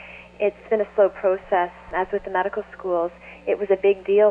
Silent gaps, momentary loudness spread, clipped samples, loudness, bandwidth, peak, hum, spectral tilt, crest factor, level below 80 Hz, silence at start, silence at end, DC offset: none; 8 LU; under 0.1%; -23 LUFS; 4.1 kHz; -6 dBFS; 60 Hz at -55 dBFS; -7.5 dB/octave; 16 dB; -54 dBFS; 0 s; 0 s; under 0.1%